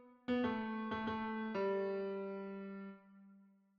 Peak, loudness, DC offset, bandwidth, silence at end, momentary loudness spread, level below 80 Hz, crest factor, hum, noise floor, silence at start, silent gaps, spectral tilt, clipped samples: -26 dBFS; -41 LUFS; under 0.1%; 6.6 kHz; 0.35 s; 12 LU; -72 dBFS; 16 dB; none; -66 dBFS; 0 s; none; -4.5 dB/octave; under 0.1%